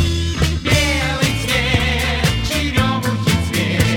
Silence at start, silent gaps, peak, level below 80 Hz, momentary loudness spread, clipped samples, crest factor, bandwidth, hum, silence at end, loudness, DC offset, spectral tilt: 0 s; none; 0 dBFS; -26 dBFS; 3 LU; under 0.1%; 16 dB; 19 kHz; none; 0 s; -17 LUFS; under 0.1%; -4.5 dB/octave